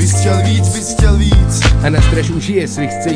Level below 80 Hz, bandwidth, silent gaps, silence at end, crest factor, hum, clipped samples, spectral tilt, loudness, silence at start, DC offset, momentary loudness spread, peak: -16 dBFS; 10.5 kHz; none; 0 s; 12 dB; none; under 0.1%; -5 dB/octave; -13 LUFS; 0 s; under 0.1%; 5 LU; 0 dBFS